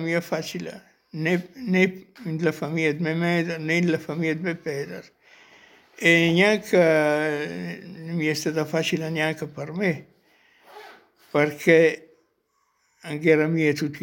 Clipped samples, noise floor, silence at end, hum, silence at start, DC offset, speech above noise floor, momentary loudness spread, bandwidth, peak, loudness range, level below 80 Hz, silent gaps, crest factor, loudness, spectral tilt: under 0.1%; -70 dBFS; 0 s; none; 0 s; under 0.1%; 47 dB; 16 LU; 17 kHz; -4 dBFS; 6 LU; -70 dBFS; none; 22 dB; -23 LUFS; -5.5 dB/octave